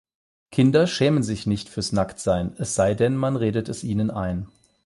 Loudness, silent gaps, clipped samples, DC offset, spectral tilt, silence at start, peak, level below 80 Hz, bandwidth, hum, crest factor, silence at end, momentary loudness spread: -23 LUFS; none; under 0.1%; under 0.1%; -6 dB/octave; 0.5 s; -6 dBFS; -46 dBFS; 11.5 kHz; none; 16 dB; 0.4 s; 9 LU